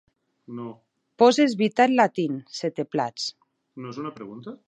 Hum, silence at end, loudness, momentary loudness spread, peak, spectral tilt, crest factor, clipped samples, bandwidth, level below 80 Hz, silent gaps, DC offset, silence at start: none; 0.1 s; -23 LUFS; 20 LU; -4 dBFS; -5 dB/octave; 20 dB; under 0.1%; 9.2 kHz; -76 dBFS; none; under 0.1%; 0.5 s